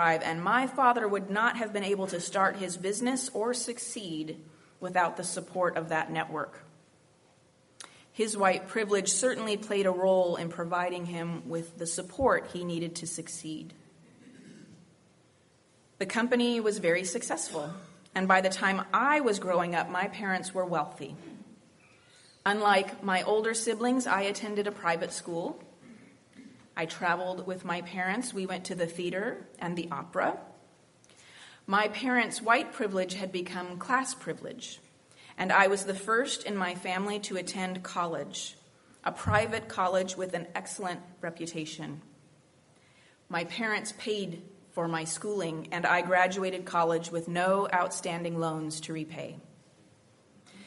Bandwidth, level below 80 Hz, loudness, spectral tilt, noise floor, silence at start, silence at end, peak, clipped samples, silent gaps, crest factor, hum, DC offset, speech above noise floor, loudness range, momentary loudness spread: 11.5 kHz; -68 dBFS; -30 LUFS; -3.5 dB/octave; -64 dBFS; 0 s; 0 s; -8 dBFS; under 0.1%; none; 24 dB; none; under 0.1%; 34 dB; 7 LU; 13 LU